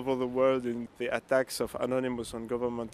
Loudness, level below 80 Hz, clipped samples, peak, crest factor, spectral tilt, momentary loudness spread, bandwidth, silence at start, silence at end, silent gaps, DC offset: -31 LUFS; -60 dBFS; under 0.1%; -12 dBFS; 18 dB; -5 dB/octave; 8 LU; 15 kHz; 0 s; 0 s; none; under 0.1%